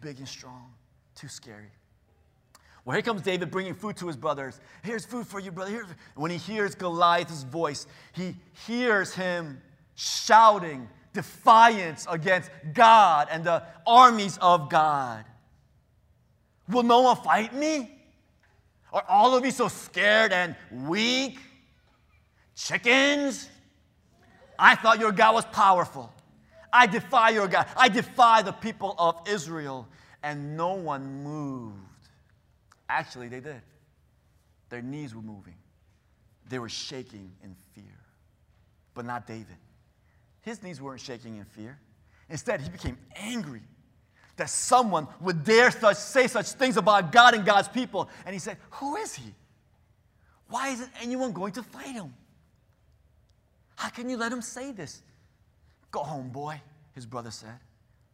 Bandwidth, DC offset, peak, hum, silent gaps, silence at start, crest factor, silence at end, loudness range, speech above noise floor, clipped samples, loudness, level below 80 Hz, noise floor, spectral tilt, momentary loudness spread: 16 kHz; under 0.1%; -2 dBFS; none; none; 0 s; 24 dB; 0.55 s; 19 LU; 40 dB; under 0.1%; -23 LUFS; -62 dBFS; -65 dBFS; -3.5 dB/octave; 23 LU